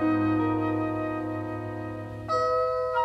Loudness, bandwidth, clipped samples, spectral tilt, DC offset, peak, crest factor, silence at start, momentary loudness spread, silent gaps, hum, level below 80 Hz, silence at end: -28 LUFS; 8.2 kHz; under 0.1%; -8 dB/octave; under 0.1%; -16 dBFS; 12 dB; 0 s; 10 LU; none; none; -54 dBFS; 0 s